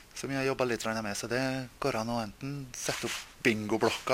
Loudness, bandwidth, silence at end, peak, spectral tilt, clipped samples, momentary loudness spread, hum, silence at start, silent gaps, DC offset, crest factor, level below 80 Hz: -32 LUFS; 16 kHz; 0 s; -10 dBFS; -4 dB/octave; under 0.1%; 7 LU; none; 0 s; none; under 0.1%; 22 dB; -58 dBFS